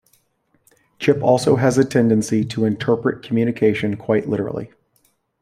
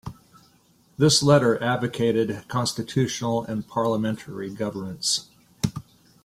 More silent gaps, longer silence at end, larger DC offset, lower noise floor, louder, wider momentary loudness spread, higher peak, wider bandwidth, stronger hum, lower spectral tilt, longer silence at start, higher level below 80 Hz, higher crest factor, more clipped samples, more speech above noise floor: neither; first, 0.75 s vs 0.45 s; neither; first, -64 dBFS vs -60 dBFS; first, -19 LUFS vs -24 LUFS; second, 7 LU vs 12 LU; first, -2 dBFS vs -6 dBFS; about the same, 14.5 kHz vs 15.5 kHz; neither; first, -6.5 dB/octave vs -4.5 dB/octave; first, 1 s vs 0.05 s; about the same, -56 dBFS vs -56 dBFS; about the same, 18 dB vs 18 dB; neither; first, 47 dB vs 36 dB